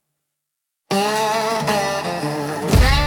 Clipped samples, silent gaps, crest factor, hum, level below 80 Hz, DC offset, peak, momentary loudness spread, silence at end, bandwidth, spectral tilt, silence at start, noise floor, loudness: under 0.1%; none; 16 dB; none; -26 dBFS; under 0.1%; -2 dBFS; 7 LU; 0 s; 17.5 kHz; -4.5 dB/octave; 0.9 s; -80 dBFS; -20 LUFS